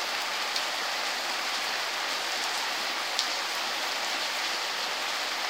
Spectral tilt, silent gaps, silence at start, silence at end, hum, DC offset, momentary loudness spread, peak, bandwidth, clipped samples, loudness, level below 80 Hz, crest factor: 1.5 dB/octave; none; 0 s; 0 s; none; under 0.1%; 1 LU; -4 dBFS; 16 kHz; under 0.1%; -28 LUFS; -82 dBFS; 28 dB